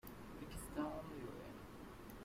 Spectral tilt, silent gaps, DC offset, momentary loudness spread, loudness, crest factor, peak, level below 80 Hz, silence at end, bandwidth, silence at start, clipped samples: -5.5 dB/octave; none; under 0.1%; 10 LU; -50 LUFS; 18 dB; -32 dBFS; -60 dBFS; 0 s; 16 kHz; 0.05 s; under 0.1%